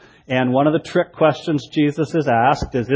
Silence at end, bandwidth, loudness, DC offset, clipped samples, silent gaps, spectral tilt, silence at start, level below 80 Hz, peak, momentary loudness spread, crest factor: 0 s; 8 kHz; -18 LUFS; under 0.1%; under 0.1%; none; -7 dB/octave; 0.3 s; -44 dBFS; -2 dBFS; 5 LU; 16 dB